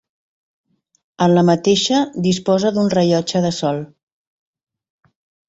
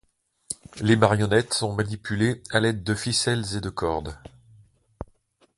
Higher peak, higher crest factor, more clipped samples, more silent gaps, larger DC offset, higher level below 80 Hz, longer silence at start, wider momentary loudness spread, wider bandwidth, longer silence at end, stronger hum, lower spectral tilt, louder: about the same, -2 dBFS vs 0 dBFS; second, 16 dB vs 26 dB; neither; neither; neither; second, -56 dBFS vs -48 dBFS; first, 1.2 s vs 0.5 s; second, 8 LU vs 22 LU; second, 8 kHz vs 11.5 kHz; first, 1.65 s vs 0.55 s; neither; about the same, -5.5 dB/octave vs -4.5 dB/octave; first, -16 LUFS vs -24 LUFS